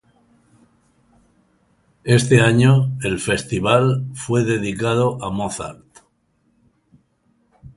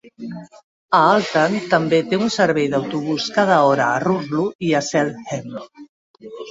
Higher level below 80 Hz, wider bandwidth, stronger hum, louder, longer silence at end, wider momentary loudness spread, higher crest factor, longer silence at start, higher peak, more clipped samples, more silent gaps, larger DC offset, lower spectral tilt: first, -48 dBFS vs -62 dBFS; first, 11.5 kHz vs 8 kHz; neither; about the same, -18 LUFS vs -18 LUFS; about the same, 0.05 s vs 0 s; second, 12 LU vs 19 LU; about the same, 20 dB vs 18 dB; first, 2.05 s vs 0.05 s; about the same, 0 dBFS vs -2 dBFS; neither; second, none vs 0.64-0.89 s, 4.55-4.59 s, 5.89-6.14 s; neither; about the same, -6 dB/octave vs -5 dB/octave